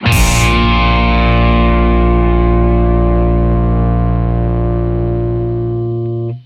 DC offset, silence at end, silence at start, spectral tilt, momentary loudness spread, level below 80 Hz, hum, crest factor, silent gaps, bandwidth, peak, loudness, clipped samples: under 0.1%; 0.05 s; 0 s; -6 dB/octave; 6 LU; -14 dBFS; none; 12 dB; none; 15 kHz; 0 dBFS; -13 LUFS; under 0.1%